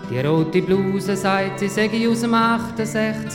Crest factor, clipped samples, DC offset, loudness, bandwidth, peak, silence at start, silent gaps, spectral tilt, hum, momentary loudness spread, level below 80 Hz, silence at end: 16 dB; under 0.1%; under 0.1%; -20 LUFS; 16.5 kHz; -4 dBFS; 0 s; none; -6 dB/octave; none; 5 LU; -52 dBFS; 0 s